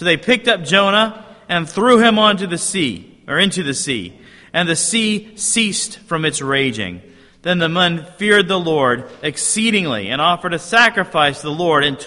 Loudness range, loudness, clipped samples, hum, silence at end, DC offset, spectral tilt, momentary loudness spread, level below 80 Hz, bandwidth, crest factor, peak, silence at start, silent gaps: 3 LU; -16 LUFS; under 0.1%; none; 0 s; under 0.1%; -3 dB/octave; 9 LU; -54 dBFS; 11.5 kHz; 16 dB; 0 dBFS; 0 s; none